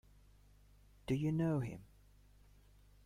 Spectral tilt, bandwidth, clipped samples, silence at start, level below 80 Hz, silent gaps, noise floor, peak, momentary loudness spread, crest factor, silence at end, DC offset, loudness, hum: -8.5 dB/octave; 14.5 kHz; under 0.1%; 1.1 s; -62 dBFS; none; -65 dBFS; -24 dBFS; 20 LU; 18 dB; 1.2 s; under 0.1%; -38 LUFS; 50 Hz at -60 dBFS